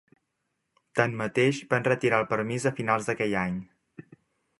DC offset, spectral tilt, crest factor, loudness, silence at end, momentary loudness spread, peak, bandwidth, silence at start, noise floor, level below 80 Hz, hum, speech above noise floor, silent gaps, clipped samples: under 0.1%; -5.5 dB/octave; 24 dB; -27 LUFS; 0.6 s; 5 LU; -4 dBFS; 11.5 kHz; 0.95 s; -79 dBFS; -62 dBFS; none; 53 dB; none; under 0.1%